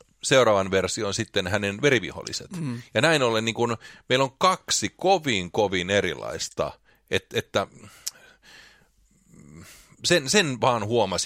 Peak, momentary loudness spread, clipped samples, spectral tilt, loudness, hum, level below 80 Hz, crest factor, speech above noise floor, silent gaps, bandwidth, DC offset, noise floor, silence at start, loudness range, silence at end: -6 dBFS; 12 LU; under 0.1%; -3.5 dB/octave; -24 LUFS; none; -58 dBFS; 20 dB; 37 dB; none; 16 kHz; under 0.1%; -61 dBFS; 0.25 s; 8 LU; 0 s